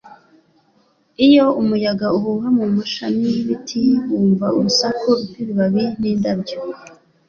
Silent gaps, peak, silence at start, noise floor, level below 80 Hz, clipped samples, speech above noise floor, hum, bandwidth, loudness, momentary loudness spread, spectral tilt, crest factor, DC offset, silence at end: none; -2 dBFS; 0.05 s; -59 dBFS; -56 dBFS; under 0.1%; 42 dB; none; 7.2 kHz; -17 LUFS; 10 LU; -5.5 dB/octave; 16 dB; under 0.1%; 0.4 s